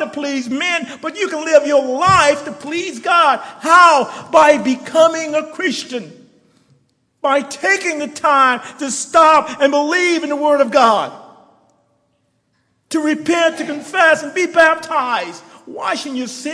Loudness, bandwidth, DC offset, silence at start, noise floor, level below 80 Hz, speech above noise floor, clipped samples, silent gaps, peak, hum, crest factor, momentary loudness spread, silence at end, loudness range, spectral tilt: -14 LUFS; 11 kHz; under 0.1%; 0 s; -64 dBFS; -54 dBFS; 49 dB; under 0.1%; none; 0 dBFS; none; 16 dB; 12 LU; 0 s; 6 LU; -3 dB/octave